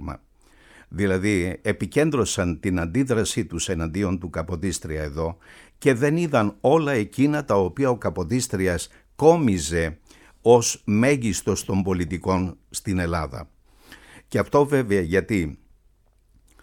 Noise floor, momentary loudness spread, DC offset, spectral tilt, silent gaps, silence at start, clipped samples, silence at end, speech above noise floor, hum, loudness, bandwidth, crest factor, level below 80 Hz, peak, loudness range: -60 dBFS; 10 LU; under 0.1%; -5.5 dB/octave; none; 0 s; under 0.1%; 1.05 s; 37 dB; none; -23 LUFS; 18 kHz; 20 dB; -44 dBFS; -2 dBFS; 4 LU